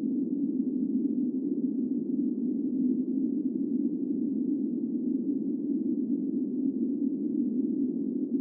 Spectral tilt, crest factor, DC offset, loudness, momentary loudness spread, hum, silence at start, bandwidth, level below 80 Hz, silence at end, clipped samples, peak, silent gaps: -17 dB/octave; 12 dB; under 0.1%; -30 LUFS; 2 LU; none; 0 s; 1 kHz; -90 dBFS; 0 s; under 0.1%; -18 dBFS; none